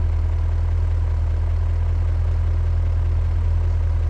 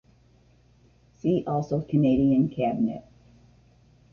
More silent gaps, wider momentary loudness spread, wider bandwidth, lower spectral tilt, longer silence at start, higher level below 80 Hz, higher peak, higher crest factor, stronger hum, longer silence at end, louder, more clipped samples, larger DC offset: neither; second, 1 LU vs 8 LU; second, 4.4 kHz vs 6.8 kHz; about the same, -8.5 dB/octave vs -9.5 dB/octave; second, 0 s vs 1.25 s; first, -22 dBFS vs -54 dBFS; about the same, -12 dBFS vs -12 dBFS; second, 8 dB vs 16 dB; neither; second, 0 s vs 1.15 s; first, -22 LUFS vs -25 LUFS; neither; neither